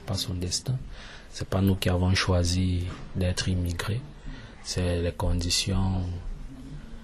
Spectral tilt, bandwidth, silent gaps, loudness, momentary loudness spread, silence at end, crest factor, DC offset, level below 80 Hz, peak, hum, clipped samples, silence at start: -5 dB/octave; 13 kHz; none; -27 LUFS; 19 LU; 0 s; 20 dB; under 0.1%; -38 dBFS; -8 dBFS; none; under 0.1%; 0 s